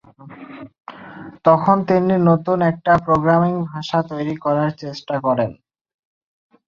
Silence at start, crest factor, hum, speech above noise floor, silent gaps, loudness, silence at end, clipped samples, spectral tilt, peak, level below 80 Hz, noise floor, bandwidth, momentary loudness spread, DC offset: 0.2 s; 18 dB; none; 23 dB; none; -18 LUFS; 1.15 s; under 0.1%; -8.5 dB/octave; 0 dBFS; -54 dBFS; -40 dBFS; 7 kHz; 22 LU; under 0.1%